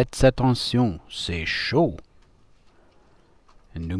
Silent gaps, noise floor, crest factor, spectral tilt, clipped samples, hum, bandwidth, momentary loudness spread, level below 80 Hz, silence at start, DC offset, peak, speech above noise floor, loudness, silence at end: none; -57 dBFS; 18 dB; -6 dB/octave; under 0.1%; none; 11 kHz; 16 LU; -40 dBFS; 0 s; under 0.1%; -6 dBFS; 35 dB; -23 LUFS; 0 s